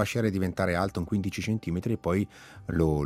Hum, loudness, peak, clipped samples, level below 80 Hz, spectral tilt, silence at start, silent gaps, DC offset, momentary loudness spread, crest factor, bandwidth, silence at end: none; -29 LUFS; -10 dBFS; under 0.1%; -48 dBFS; -7 dB/octave; 0 s; none; under 0.1%; 4 LU; 18 dB; 15.5 kHz; 0 s